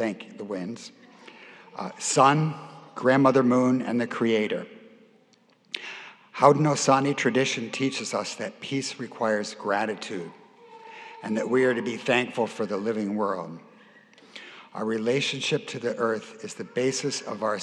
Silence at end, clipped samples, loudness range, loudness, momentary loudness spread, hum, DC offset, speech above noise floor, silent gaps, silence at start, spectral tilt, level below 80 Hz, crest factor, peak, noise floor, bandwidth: 0 s; under 0.1%; 6 LU; -25 LUFS; 21 LU; none; under 0.1%; 36 dB; none; 0 s; -4.5 dB/octave; -86 dBFS; 26 dB; -2 dBFS; -61 dBFS; 11.5 kHz